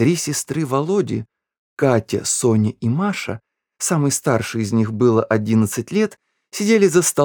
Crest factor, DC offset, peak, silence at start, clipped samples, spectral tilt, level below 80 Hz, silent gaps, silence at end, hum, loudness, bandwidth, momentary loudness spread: 18 dB; under 0.1%; -2 dBFS; 0 s; under 0.1%; -5 dB/octave; -58 dBFS; 1.59-1.77 s; 0 s; none; -19 LUFS; over 20 kHz; 9 LU